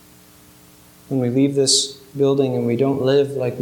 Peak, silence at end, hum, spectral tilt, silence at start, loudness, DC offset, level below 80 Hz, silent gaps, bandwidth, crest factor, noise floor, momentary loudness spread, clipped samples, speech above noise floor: -2 dBFS; 0 s; 60 Hz at -45 dBFS; -4.5 dB/octave; 1.1 s; -18 LUFS; under 0.1%; -60 dBFS; none; 18.5 kHz; 18 dB; -48 dBFS; 7 LU; under 0.1%; 30 dB